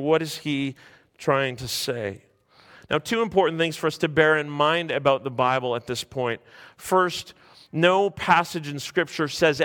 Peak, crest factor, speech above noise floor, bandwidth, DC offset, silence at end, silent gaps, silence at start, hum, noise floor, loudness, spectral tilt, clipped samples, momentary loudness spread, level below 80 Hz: -2 dBFS; 22 dB; 30 dB; 17.5 kHz; under 0.1%; 0 s; none; 0 s; none; -54 dBFS; -24 LUFS; -4.5 dB/octave; under 0.1%; 11 LU; -60 dBFS